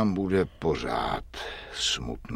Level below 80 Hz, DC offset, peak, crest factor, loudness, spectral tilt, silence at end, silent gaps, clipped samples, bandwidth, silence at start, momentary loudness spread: -44 dBFS; under 0.1%; -12 dBFS; 18 dB; -29 LUFS; -4.5 dB/octave; 0 s; none; under 0.1%; 15 kHz; 0 s; 10 LU